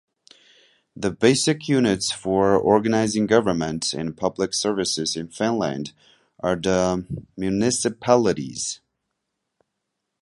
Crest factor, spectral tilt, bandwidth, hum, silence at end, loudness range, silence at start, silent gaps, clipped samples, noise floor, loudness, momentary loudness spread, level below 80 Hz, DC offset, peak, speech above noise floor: 22 dB; -4.5 dB/octave; 11.5 kHz; none; 1.45 s; 4 LU; 0.95 s; none; under 0.1%; -80 dBFS; -22 LUFS; 10 LU; -52 dBFS; under 0.1%; -2 dBFS; 58 dB